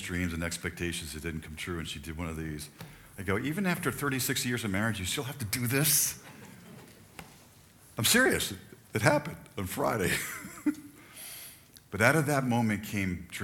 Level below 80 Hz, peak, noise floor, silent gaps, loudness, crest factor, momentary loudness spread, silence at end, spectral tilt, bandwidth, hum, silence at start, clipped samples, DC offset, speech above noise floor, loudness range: -54 dBFS; -6 dBFS; -57 dBFS; none; -30 LUFS; 26 dB; 22 LU; 0 s; -3.5 dB/octave; 19 kHz; none; 0 s; under 0.1%; under 0.1%; 26 dB; 6 LU